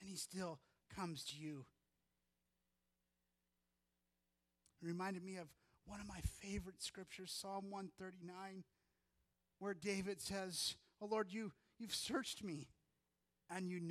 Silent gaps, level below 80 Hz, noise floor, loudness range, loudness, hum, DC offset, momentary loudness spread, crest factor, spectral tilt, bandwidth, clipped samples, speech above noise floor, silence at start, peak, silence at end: none; -66 dBFS; -89 dBFS; 10 LU; -48 LUFS; 60 Hz at -80 dBFS; under 0.1%; 12 LU; 20 dB; -4 dB/octave; 15 kHz; under 0.1%; 41 dB; 0 s; -30 dBFS; 0 s